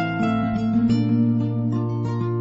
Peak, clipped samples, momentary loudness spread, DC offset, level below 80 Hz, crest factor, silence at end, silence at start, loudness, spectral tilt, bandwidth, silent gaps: -10 dBFS; under 0.1%; 5 LU; under 0.1%; -48 dBFS; 12 dB; 0 s; 0 s; -22 LUFS; -9 dB/octave; 7.6 kHz; none